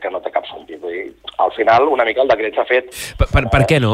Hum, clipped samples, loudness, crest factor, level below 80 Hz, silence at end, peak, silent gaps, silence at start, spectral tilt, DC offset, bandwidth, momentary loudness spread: none; under 0.1%; -16 LUFS; 14 dB; -28 dBFS; 0 s; -2 dBFS; none; 0 s; -6 dB/octave; under 0.1%; 16 kHz; 14 LU